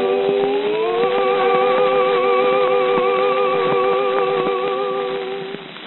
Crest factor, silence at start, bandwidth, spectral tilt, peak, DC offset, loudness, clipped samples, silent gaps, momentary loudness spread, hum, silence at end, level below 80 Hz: 14 dB; 0 s; 4.2 kHz; -2 dB/octave; -2 dBFS; 0.2%; -17 LUFS; under 0.1%; none; 7 LU; none; 0 s; -70 dBFS